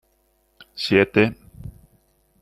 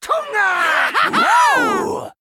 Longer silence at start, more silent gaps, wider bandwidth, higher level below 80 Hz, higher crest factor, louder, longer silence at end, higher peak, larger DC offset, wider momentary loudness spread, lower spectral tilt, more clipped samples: first, 0.75 s vs 0 s; neither; second, 13.5 kHz vs 17.5 kHz; first, -52 dBFS vs -62 dBFS; first, 22 dB vs 12 dB; second, -20 LUFS vs -15 LUFS; first, 0.7 s vs 0.1 s; about the same, -2 dBFS vs -4 dBFS; neither; first, 24 LU vs 7 LU; first, -6.5 dB/octave vs -2 dB/octave; neither